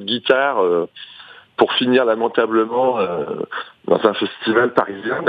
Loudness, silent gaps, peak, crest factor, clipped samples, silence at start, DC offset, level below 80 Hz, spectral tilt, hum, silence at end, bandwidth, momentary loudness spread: -18 LUFS; none; 0 dBFS; 18 dB; under 0.1%; 0 s; under 0.1%; -66 dBFS; -7 dB/octave; none; 0 s; 5.2 kHz; 12 LU